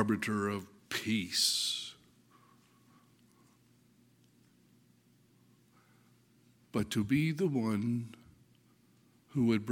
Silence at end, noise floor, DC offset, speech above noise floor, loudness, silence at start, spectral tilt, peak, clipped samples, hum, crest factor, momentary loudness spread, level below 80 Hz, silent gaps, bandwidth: 0 s; -67 dBFS; under 0.1%; 35 dB; -33 LUFS; 0 s; -4 dB/octave; -14 dBFS; under 0.1%; 60 Hz at -70 dBFS; 22 dB; 11 LU; -70 dBFS; none; 17 kHz